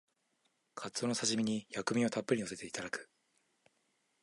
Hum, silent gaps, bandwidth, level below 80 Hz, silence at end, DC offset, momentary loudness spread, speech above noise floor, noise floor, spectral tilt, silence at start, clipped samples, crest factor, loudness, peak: none; none; 11.5 kHz; -76 dBFS; 1.15 s; under 0.1%; 11 LU; 43 dB; -79 dBFS; -3.5 dB/octave; 0.75 s; under 0.1%; 22 dB; -36 LUFS; -16 dBFS